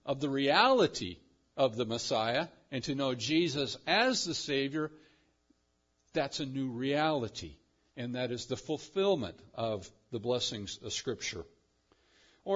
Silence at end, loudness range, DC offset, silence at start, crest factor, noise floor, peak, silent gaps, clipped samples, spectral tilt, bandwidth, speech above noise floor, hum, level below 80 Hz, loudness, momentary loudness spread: 0 s; 6 LU; under 0.1%; 0.05 s; 24 dB; -76 dBFS; -10 dBFS; none; under 0.1%; -3 dB/octave; 7.4 kHz; 43 dB; none; -68 dBFS; -32 LUFS; 14 LU